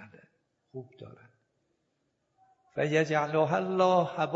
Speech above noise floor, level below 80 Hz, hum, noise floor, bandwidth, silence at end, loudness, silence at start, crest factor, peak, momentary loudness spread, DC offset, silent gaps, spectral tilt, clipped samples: 49 dB; -76 dBFS; none; -78 dBFS; 8 kHz; 0 s; -27 LUFS; 0 s; 18 dB; -12 dBFS; 21 LU; under 0.1%; none; -6 dB/octave; under 0.1%